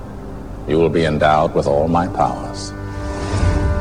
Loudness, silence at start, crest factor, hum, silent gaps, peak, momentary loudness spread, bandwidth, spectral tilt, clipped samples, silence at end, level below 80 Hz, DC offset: -18 LUFS; 0 s; 14 dB; none; none; -2 dBFS; 14 LU; 10.5 kHz; -6.5 dB/octave; under 0.1%; 0 s; -28 dBFS; 0.9%